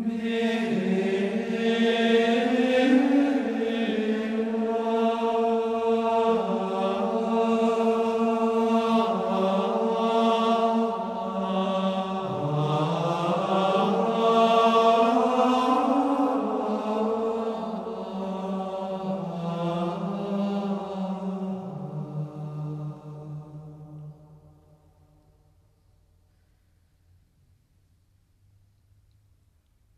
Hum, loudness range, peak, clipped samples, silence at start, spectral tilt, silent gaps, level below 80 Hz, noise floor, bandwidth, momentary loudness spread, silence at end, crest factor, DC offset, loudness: none; 12 LU; -8 dBFS; under 0.1%; 0 s; -6.5 dB/octave; none; -66 dBFS; -64 dBFS; 11 kHz; 13 LU; 5.6 s; 16 dB; under 0.1%; -25 LUFS